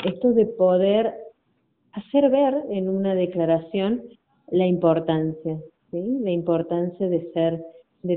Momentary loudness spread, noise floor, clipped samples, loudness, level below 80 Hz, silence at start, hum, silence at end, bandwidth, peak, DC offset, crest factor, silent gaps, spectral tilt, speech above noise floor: 12 LU; -69 dBFS; under 0.1%; -22 LUFS; -62 dBFS; 0 s; none; 0 s; 4.1 kHz; -8 dBFS; under 0.1%; 16 dB; none; -7 dB/octave; 47 dB